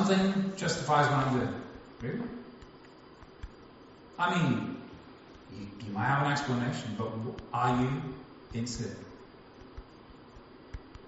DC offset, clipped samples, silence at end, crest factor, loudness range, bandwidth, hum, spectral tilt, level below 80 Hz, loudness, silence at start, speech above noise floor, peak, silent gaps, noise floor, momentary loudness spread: under 0.1%; under 0.1%; 0 s; 20 dB; 4 LU; 8 kHz; none; -5 dB/octave; -56 dBFS; -31 LUFS; 0 s; 23 dB; -12 dBFS; none; -53 dBFS; 25 LU